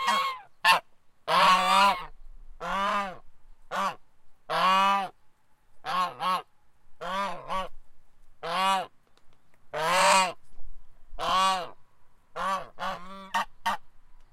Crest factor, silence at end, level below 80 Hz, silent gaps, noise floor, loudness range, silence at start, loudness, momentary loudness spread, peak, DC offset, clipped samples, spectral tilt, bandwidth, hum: 22 dB; 0.1 s; -52 dBFS; none; -55 dBFS; 8 LU; 0 s; -26 LUFS; 19 LU; -8 dBFS; under 0.1%; under 0.1%; -1.5 dB/octave; 16 kHz; none